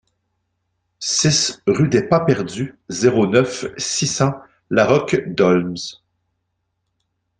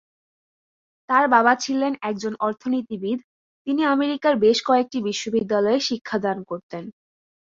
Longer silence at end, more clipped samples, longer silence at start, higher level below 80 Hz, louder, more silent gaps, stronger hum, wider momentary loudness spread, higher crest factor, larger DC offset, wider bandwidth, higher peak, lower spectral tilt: first, 1.45 s vs 0.65 s; neither; about the same, 1 s vs 1.1 s; first, -54 dBFS vs -66 dBFS; first, -18 LUFS vs -22 LUFS; second, none vs 3.24-3.65 s, 6.01-6.05 s, 6.63-6.69 s; neither; second, 11 LU vs 14 LU; about the same, 18 dB vs 20 dB; neither; first, 10 kHz vs 7.6 kHz; about the same, -2 dBFS vs -4 dBFS; about the same, -4.5 dB/octave vs -4 dB/octave